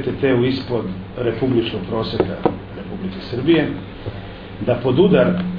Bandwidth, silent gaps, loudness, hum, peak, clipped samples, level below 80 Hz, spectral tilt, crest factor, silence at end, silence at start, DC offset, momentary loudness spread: 5.2 kHz; none; -19 LUFS; none; 0 dBFS; under 0.1%; -42 dBFS; -9.5 dB/octave; 18 dB; 0 s; 0 s; under 0.1%; 16 LU